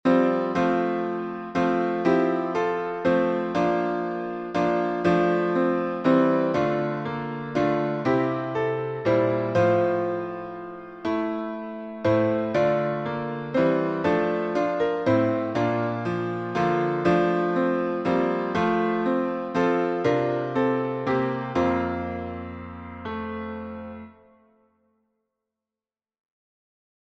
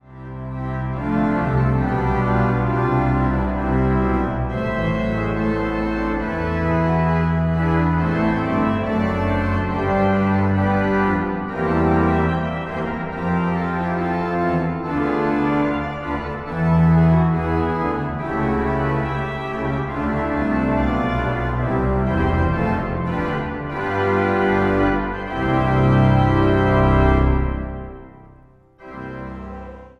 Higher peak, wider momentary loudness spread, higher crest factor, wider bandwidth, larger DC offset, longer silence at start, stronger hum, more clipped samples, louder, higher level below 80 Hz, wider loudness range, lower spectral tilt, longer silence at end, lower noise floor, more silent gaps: second, -8 dBFS vs -4 dBFS; about the same, 11 LU vs 9 LU; about the same, 18 dB vs 16 dB; first, 7.8 kHz vs 6.6 kHz; neither; about the same, 0.05 s vs 0.1 s; neither; neither; second, -24 LUFS vs -20 LUFS; second, -58 dBFS vs -30 dBFS; about the same, 6 LU vs 4 LU; about the same, -8 dB/octave vs -9 dB/octave; first, 2.95 s vs 0.1 s; first, under -90 dBFS vs -49 dBFS; neither